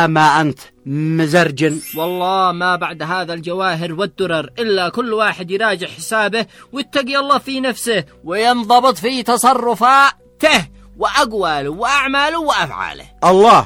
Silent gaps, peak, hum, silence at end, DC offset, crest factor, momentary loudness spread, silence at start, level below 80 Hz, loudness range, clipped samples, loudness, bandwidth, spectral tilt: none; 0 dBFS; none; 0 s; under 0.1%; 16 dB; 10 LU; 0 s; -48 dBFS; 5 LU; under 0.1%; -15 LUFS; 19.5 kHz; -4 dB/octave